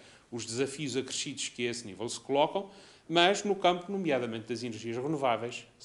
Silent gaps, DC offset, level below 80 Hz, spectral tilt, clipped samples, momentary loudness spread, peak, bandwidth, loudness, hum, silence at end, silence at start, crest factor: none; under 0.1%; -72 dBFS; -3.5 dB/octave; under 0.1%; 12 LU; -8 dBFS; 11.5 kHz; -31 LUFS; none; 0 s; 0 s; 24 dB